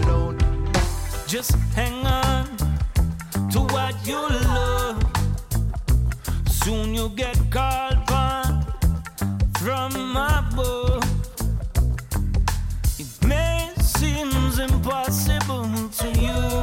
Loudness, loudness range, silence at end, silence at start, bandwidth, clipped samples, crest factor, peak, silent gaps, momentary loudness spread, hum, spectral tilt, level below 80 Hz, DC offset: -23 LUFS; 1 LU; 0 s; 0 s; 17 kHz; under 0.1%; 12 dB; -10 dBFS; none; 4 LU; none; -5 dB/octave; -24 dBFS; under 0.1%